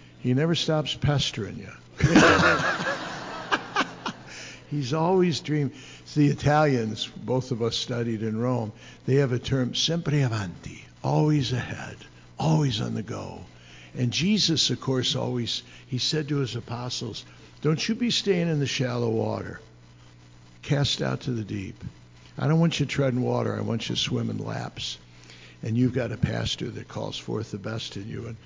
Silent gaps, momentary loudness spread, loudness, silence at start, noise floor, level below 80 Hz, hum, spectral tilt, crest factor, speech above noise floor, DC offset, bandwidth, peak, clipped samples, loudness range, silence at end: none; 15 LU; -26 LUFS; 0 s; -51 dBFS; -50 dBFS; none; -5 dB/octave; 18 dB; 25 dB; under 0.1%; 7.6 kHz; -8 dBFS; under 0.1%; 5 LU; 0.1 s